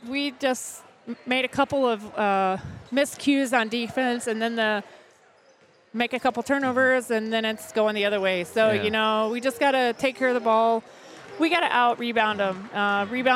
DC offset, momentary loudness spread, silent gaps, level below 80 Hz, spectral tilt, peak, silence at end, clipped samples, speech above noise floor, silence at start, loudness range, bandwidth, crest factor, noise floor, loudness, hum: under 0.1%; 7 LU; none; -64 dBFS; -4 dB/octave; -6 dBFS; 0 s; under 0.1%; 34 dB; 0 s; 3 LU; 16 kHz; 18 dB; -57 dBFS; -24 LUFS; none